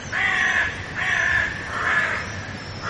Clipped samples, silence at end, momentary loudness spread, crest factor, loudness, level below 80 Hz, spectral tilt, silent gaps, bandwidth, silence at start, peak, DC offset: under 0.1%; 0 s; 10 LU; 14 dB; -21 LUFS; -46 dBFS; -3 dB/octave; none; 11.5 kHz; 0 s; -10 dBFS; under 0.1%